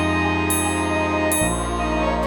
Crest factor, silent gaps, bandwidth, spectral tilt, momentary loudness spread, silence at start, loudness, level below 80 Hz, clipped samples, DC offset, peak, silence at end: 12 dB; none; over 20 kHz; -4 dB/octave; 3 LU; 0 s; -20 LUFS; -32 dBFS; under 0.1%; under 0.1%; -8 dBFS; 0 s